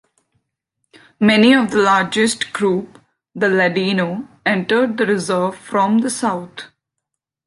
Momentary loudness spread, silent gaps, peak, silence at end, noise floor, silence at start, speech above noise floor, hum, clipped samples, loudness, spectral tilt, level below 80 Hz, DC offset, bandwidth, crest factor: 11 LU; none; -2 dBFS; 0.8 s; -80 dBFS; 1.2 s; 64 dB; none; under 0.1%; -16 LUFS; -4.5 dB/octave; -62 dBFS; under 0.1%; 11.5 kHz; 16 dB